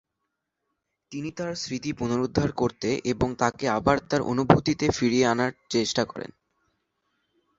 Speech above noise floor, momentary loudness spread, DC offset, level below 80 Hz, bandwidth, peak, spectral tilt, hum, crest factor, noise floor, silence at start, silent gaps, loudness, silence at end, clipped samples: 56 dB; 11 LU; under 0.1%; -50 dBFS; 8 kHz; 0 dBFS; -5 dB/octave; none; 26 dB; -81 dBFS; 1.1 s; none; -25 LUFS; 1.3 s; under 0.1%